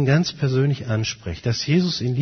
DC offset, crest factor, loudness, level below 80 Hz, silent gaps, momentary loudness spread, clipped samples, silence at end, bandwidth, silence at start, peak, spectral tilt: under 0.1%; 16 dB; -22 LUFS; -48 dBFS; none; 6 LU; under 0.1%; 0 s; 6.6 kHz; 0 s; -6 dBFS; -6 dB/octave